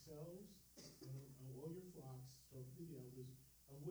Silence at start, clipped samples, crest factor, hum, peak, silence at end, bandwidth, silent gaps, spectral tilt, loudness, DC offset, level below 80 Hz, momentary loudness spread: 0 s; under 0.1%; 16 dB; none; -40 dBFS; 0 s; over 20 kHz; none; -6.5 dB/octave; -57 LUFS; under 0.1%; -78 dBFS; 7 LU